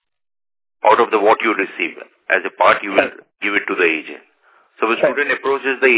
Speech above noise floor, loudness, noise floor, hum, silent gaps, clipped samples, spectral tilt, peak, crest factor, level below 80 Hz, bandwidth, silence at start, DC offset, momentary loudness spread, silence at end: 37 dB; -17 LUFS; -54 dBFS; none; none; under 0.1%; -7 dB/octave; 0 dBFS; 18 dB; -64 dBFS; 4 kHz; 0.85 s; under 0.1%; 10 LU; 0 s